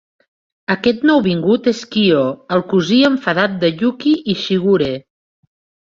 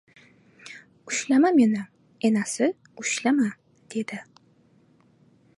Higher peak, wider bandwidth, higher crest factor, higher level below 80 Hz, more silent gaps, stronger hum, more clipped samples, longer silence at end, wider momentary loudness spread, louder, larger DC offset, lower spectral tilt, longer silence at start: first, -2 dBFS vs -10 dBFS; second, 7.6 kHz vs 11.5 kHz; about the same, 14 dB vs 16 dB; first, -54 dBFS vs -78 dBFS; neither; neither; neither; second, 0.85 s vs 1.35 s; second, 6 LU vs 24 LU; first, -15 LUFS vs -24 LUFS; neither; first, -6 dB/octave vs -4 dB/octave; about the same, 0.7 s vs 0.65 s